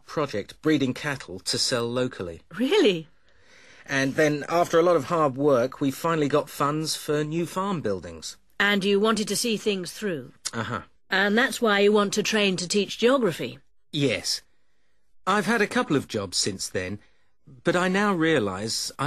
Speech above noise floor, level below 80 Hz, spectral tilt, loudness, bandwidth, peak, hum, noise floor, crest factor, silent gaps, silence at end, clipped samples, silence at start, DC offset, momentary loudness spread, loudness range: 49 dB; -62 dBFS; -4 dB/octave; -24 LUFS; 13.5 kHz; -8 dBFS; none; -73 dBFS; 18 dB; none; 0 s; under 0.1%; 0.1 s; 0.2%; 11 LU; 3 LU